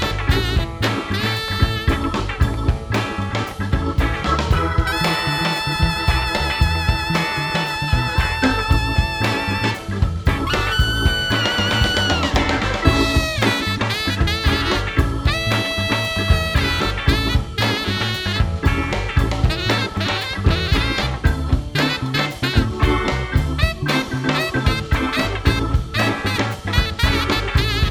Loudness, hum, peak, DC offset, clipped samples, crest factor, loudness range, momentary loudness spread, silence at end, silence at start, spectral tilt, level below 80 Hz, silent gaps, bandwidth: -19 LUFS; none; 0 dBFS; under 0.1%; under 0.1%; 18 dB; 2 LU; 4 LU; 0 s; 0 s; -5 dB/octave; -24 dBFS; none; 17.5 kHz